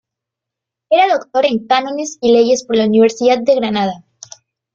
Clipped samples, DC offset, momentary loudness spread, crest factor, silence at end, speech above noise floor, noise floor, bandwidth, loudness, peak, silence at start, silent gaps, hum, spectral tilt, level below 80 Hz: under 0.1%; under 0.1%; 7 LU; 14 dB; 0.75 s; 70 dB; -83 dBFS; 7.8 kHz; -14 LUFS; -2 dBFS; 0.9 s; none; none; -4.5 dB/octave; -58 dBFS